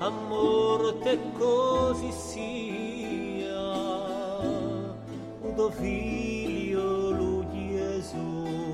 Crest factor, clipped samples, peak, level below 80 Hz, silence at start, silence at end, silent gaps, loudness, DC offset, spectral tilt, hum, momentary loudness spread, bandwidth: 16 dB; under 0.1%; -12 dBFS; -48 dBFS; 0 s; 0 s; none; -29 LUFS; under 0.1%; -6 dB/octave; none; 10 LU; 13.5 kHz